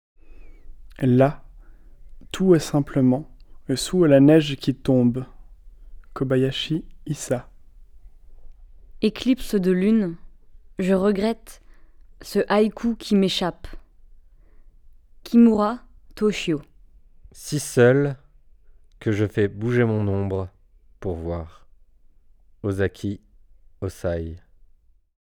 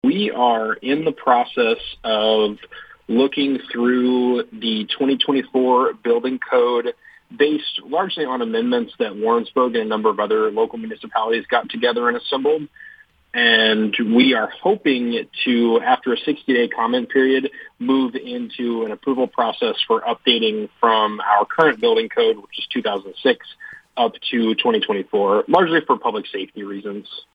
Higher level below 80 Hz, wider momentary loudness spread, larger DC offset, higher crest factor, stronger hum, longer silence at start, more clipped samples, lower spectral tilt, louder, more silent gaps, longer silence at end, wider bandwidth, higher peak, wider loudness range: first, -46 dBFS vs -64 dBFS; first, 17 LU vs 9 LU; neither; about the same, 20 dB vs 18 dB; neither; first, 0.3 s vs 0.05 s; neither; about the same, -6.5 dB/octave vs -6.5 dB/octave; second, -22 LUFS vs -19 LUFS; neither; first, 0.85 s vs 0.15 s; first, 18 kHz vs 5 kHz; second, -4 dBFS vs 0 dBFS; first, 9 LU vs 3 LU